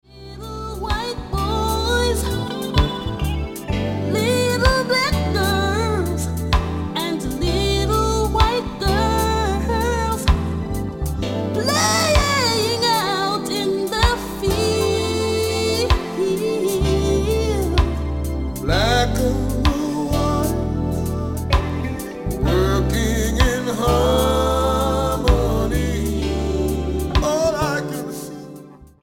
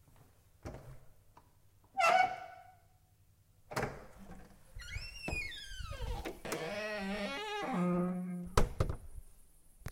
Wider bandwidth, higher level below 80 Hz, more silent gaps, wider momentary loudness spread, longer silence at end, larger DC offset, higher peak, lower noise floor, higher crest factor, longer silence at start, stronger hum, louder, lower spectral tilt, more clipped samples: about the same, 17 kHz vs 16 kHz; first, -26 dBFS vs -46 dBFS; neither; second, 8 LU vs 23 LU; first, 0.2 s vs 0 s; neither; first, -2 dBFS vs -10 dBFS; second, -41 dBFS vs -67 dBFS; second, 18 dB vs 28 dB; about the same, 0.15 s vs 0.2 s; neither; first, -20 LUFS vs -37 LUFS; about the same, -5 dB/octave vs -5 dB/octave; neither